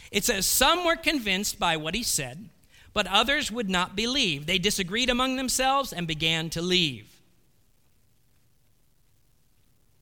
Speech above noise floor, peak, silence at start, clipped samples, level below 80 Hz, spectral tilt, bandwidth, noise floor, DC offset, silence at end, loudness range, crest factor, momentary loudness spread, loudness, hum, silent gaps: 41 dB; -6 dBFS; 0 s; under 0.1%; -48 dBFS; -2.5 dB/octave; 19 kHz; -67 dBFS; under 0.1%; 3 s; 5 LU; 20 dB; 7 LU; -24 LUFS; none; none